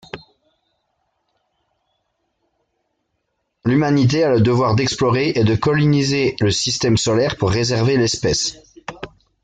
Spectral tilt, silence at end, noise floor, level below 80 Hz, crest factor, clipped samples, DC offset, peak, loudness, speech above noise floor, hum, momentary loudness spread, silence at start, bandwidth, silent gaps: -5 dB/octave; 0.35 s; -72 dBFS; -46 dBFS; 14 dB; under 0.1%; under 0.1%; -4 dBFS; -17 LUFS; 56 dB; none; 18 LU; 0.15 s; 9.4 kHz; none